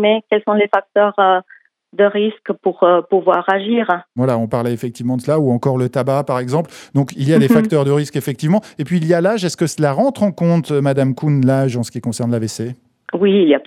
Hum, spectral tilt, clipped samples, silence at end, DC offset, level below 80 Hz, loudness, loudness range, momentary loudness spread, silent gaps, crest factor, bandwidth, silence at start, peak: none; -6.5 dB/octave; under 0.1%; 0.05 s; under 0.1%; -62 dBFS; -16 LUFS; 2 LU; 8 LU; none; 16 dB; 14.5 kHz; 0 s; 0 dBFS